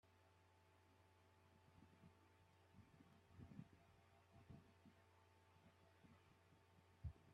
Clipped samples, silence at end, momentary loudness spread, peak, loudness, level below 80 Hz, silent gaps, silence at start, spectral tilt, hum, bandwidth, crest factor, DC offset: under 0.1%; 0 s; 8 LU; -42 dBFS; -64 LUFS; -76 dBFS; none; 0.05 s; -6.5 dB/octave; none; 8.4 kHz; 26 dB; under 0.1%